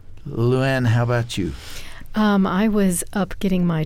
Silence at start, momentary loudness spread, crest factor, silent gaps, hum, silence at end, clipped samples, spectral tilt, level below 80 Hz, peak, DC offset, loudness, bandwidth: 0.05 s; 12 LU; 12 dB; none; none; 0 s; under 0.1%; -6 dB/octave; -36 dBFS; -8 dBFS; under 0.1%; -20 LUFS; 16 kHz